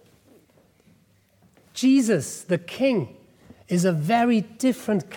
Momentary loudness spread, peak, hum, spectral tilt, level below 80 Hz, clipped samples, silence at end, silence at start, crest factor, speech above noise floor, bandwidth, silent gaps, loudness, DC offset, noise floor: 8 LU; -10 dBFS; none; -5.5 dB/octave; -68 dBFS; under 0.1%; 0 s; 1.75 s; 14 dB; 39 dB; 18 kHz; none; -23 LUFS; under 0.1%; -61 dBFS